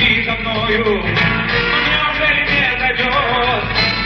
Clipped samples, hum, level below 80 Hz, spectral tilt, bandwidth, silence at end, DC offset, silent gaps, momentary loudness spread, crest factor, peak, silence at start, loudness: under 0.1%; none; -32 dBFS; -5.5 dB/octave; 7 kHz; 0 s; under 0.1%; none; 3 LU; 14 dB; -2 dBFS; 0 s; -14 LUFS